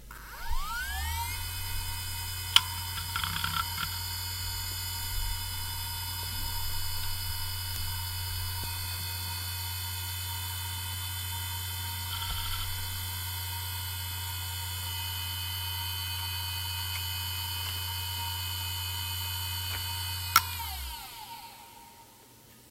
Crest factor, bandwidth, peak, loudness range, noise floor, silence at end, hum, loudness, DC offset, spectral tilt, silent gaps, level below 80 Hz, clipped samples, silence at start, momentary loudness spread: 32 dB; 16 kHz; -2 dBFS; 4 LU; -55 dBFS; 0 s; none; -32 LUFS; under 0.1%; -1 dB/octave; none; -44 dBFS; under 0.1%; 0 s; 4 LU